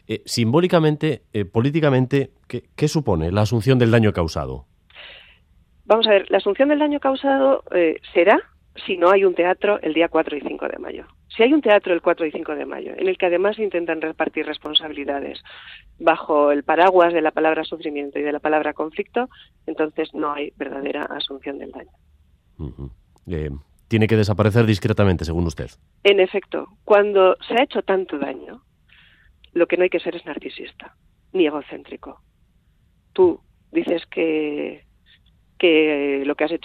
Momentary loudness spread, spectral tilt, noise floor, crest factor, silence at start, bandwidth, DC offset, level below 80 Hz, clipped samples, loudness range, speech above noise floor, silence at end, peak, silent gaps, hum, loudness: 18 LU; -6.5 dB/octave; -59 dBFS; 20 dB; 0.1 s; 14 kHz; under 0.1%; -48 dBFS; under 0.1%; 7 LU; 40 dB; 0.1 s; 0 dBFS; none; none; -20 LUFS